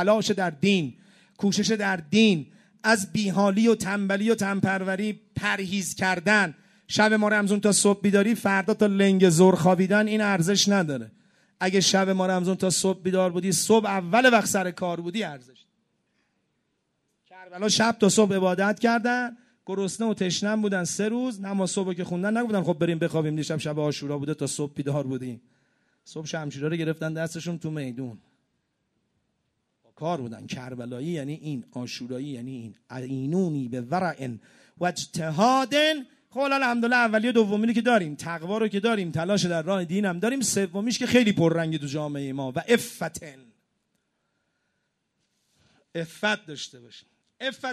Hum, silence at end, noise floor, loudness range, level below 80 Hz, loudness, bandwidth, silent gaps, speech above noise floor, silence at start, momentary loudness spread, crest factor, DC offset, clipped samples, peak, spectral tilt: none; 0 s; -76 dBFS; 13 LU; -66 dBFS; -24 LUFS; 13.5 kHz; none; 52 dB; 0 s; 14 LU; 20 dB; under 0.1%; under 0.1%; -4 dBFS; -4.5 dB/octave